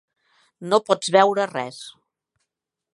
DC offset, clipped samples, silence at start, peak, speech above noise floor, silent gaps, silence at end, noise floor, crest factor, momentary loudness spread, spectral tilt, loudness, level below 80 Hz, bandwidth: under 0.1%; under 0.1%; 0.6 s; -2 dBFS; 61 dB; none; 1.05 s; -82 dBFS; 22 dB; 22 LU; -3.5 dB/octave; -20 LUFS; -76 dBFS; 11.5 kHz